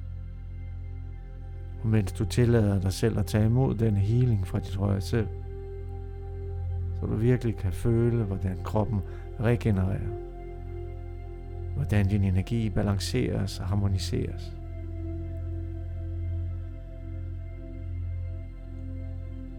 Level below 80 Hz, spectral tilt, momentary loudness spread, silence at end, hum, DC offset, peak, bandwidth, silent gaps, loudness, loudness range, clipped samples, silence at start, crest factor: -40 dBFS; -7.5 dB/octave; 15 LU; 0 s; none; under 0.1%; -10 dBFS; 15.5 kHz; none; -29 LUFS; 10 LU; under 0.1%; 0 s; 18 dB